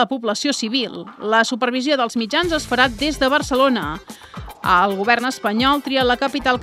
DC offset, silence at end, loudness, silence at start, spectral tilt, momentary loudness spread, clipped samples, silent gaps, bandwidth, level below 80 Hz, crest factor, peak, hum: under 0.1%; 0 s; -18 LUFS; 0 s; -3.5 dB/octave; 11 LU; under 0.1%; none; 16 kHz; -42 dBFS; 18 dB; 0 dBFS; none